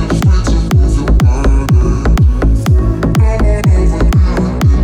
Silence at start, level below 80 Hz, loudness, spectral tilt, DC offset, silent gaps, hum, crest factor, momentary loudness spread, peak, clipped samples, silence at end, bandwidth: 0 s; -12 dBFS; -12 LUFS; -7.5 dB/octave; under 0.1%; none; none; 8 dB; 2 LU; -2 dBFS; under 0.1%; 0 s; 13.5 kHz